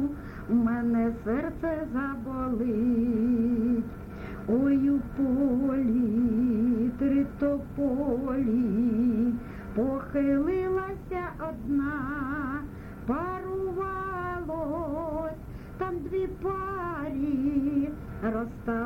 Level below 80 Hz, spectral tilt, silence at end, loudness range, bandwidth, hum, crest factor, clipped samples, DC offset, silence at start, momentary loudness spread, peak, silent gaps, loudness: -46 dBFS; -9.5 dB/octave; 0 s; 6 LU; 5.2 kHz; none; 12 dB; under 0.1%; under 0.1%; 0 s; 9 LU; -14 dBFS; none; -29 LUFS